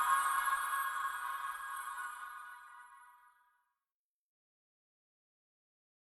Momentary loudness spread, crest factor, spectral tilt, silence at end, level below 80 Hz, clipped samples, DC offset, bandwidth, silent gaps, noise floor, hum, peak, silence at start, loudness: 21 LU; 22 dB; 2.5 dB/octave; 2.85 s; -78 dBFS; under 0.1%; under 0.1%; 14 kHz; none; under -90 dBFS; none; -20 dBFS; 0 s; -37 LUFS